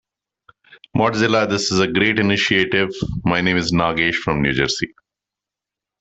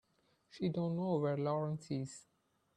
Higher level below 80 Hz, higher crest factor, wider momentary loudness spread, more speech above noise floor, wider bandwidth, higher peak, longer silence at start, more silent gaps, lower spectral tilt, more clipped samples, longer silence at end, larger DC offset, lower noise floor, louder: first, -44 dBFS vs -76 dBFS; about the same, 18 dB vs 16 dB; about the same, 6 LU vs 8 LU; first, 68 dB vs 37 dB; second, 8.4 kHz vs 10 kHz; first, -2 dBFS vs -22 dBFS; first, 0.95 s vs 0.55 s; neither; second, -4.5 dB/octave vs -7.5 dB/octave; neither; first, 1.15 s vs 0.55 s; neither; first, -87 dBFS vs -74 dBFS; first, -18 LUFS vs -38 LUFS